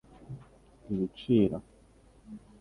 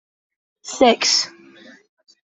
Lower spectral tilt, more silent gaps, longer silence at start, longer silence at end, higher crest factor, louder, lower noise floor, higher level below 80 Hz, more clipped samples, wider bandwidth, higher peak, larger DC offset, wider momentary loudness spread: first, -9 dB/octave vs -1 dB/octave; neither; second, 0.3 s vs 0.65 s; second, 0.25 s vs 0.95 s; about the same, 20 dB vs 20 dB; second, -30 LUFS vs -17 LUFS; first, -59 dBFS vs -46 dBFS; about the same, -58 dBFS vs -62 dBFS; neither; first, 11 kHz vs 8.4 kHz; second, -12 dBFS vs -2 dBFS; neither; first, 24 LU vs 19 LU